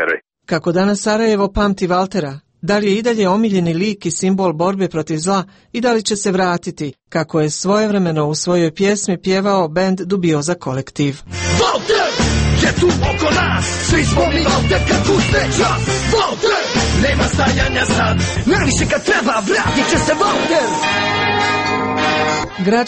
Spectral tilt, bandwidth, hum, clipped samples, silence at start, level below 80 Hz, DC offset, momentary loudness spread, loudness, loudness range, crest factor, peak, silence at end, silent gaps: -4.5 dB/octave; 8.8 kHz; none; under 0.1%; 0 s; -30 dBFS; under 0.1%; 5 LU; -16 LUFS; 3 LU; 12 dB; -2 dBFS; 0 s; none